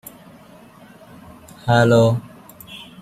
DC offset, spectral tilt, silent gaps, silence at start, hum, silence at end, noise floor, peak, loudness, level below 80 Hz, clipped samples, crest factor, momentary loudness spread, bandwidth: under 0.1%; -6.5 dB/octave; none; 1.65 s; none; 0.2 s; -45 dBFS; -2 dBFS; -17 LUFS; -52 dBFS; under 0.1%; 20 dB; 26 LU; 15.5 kHz